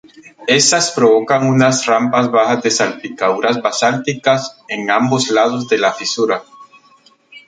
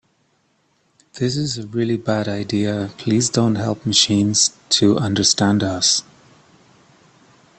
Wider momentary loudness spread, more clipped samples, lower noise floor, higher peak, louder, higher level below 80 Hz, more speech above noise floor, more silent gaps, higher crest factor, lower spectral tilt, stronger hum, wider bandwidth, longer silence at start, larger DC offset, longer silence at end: about the same, 7 LU vs 8 LU; neither; second, -50 dBFS vs -63 dBFS; about the same, 0 dBFS vs 0 dBFS; first, -14 LUFS vs -18 LUFS; second, -62 dBFS vs -56 dBFS; second, 36 dB vs 45 dB; neither; second, 14 dB vs 20 dB; about the same, -3.5 dB/octave vs -3.5 dB/octave; neither; about the same, 9.4 kHz vs 9 kHz; second, 0.4 s vs 1.15 s; neither; second, 0.1 s vs 1.6 s